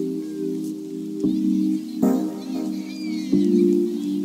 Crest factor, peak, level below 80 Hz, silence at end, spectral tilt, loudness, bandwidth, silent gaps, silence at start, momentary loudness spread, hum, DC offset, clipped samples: 16 dB; -6 dBFS; -60 dBFS; 0 s; -7.5 dB/octave; -23 LUFS; 16 kHz; none; 0 s; 11 LU; none; under 0.1%; under 0.1%